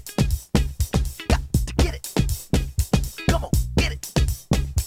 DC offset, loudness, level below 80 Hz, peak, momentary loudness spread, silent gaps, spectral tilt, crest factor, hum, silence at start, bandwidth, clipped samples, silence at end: under 0.1%; -24 LUFS; -26 dBFS; -6 dBFS; 3 LU; none; -5.5 dB/octave; 16 dB; none; 0 s; 17 kHz; under 0.1%; 0 s